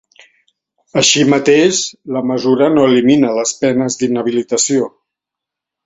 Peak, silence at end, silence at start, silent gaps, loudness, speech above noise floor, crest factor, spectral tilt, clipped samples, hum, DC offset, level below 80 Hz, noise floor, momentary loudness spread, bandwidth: 0 dBFS; 1 s; 0.95 s; none; -13 LUFS; 70 dB; 14 dB; -3.5 dB/octave; under 0.1%; none; under 0.1%; -56 dBFS; -83 dBFS; 8 LU; 8.2 kHz